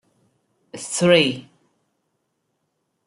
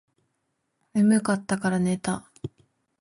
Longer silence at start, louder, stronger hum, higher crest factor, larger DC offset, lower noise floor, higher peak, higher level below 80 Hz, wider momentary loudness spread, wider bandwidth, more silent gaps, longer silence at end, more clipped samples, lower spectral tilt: second, 0.75 s vs 0.95 s; first, -18 LUFS vs -25 LUFS; neither; first, 22 dB vs 16 dB; neither; about the same, -74 dBFS vs -76 dBFS; first, -2 dBFS vs -10 dBFS; second, -68 dBFS vs -60 dBFS; about the same, 20 LU vs 20 LU; about the same, 11.5 kHz vs 11.5 kHz; neither; first, 1.65 s vs 0.55 s; neither; second, -4 dB/octave vs -6 dB/octave